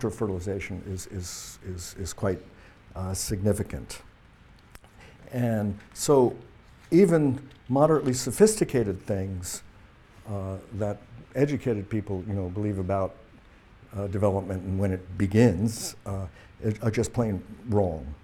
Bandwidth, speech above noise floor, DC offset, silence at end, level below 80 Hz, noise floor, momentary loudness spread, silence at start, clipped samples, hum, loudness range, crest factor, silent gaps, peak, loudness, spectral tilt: 17 kHz; 27 dB; under 0.1%; 0.1 s; -50 dBFS; -54 dBFS; 15 LU; 0 s; under 0.1%; none; 9 LU; 22 dB; none; -6 dBFS; -27 LUFS; -6 dB/octave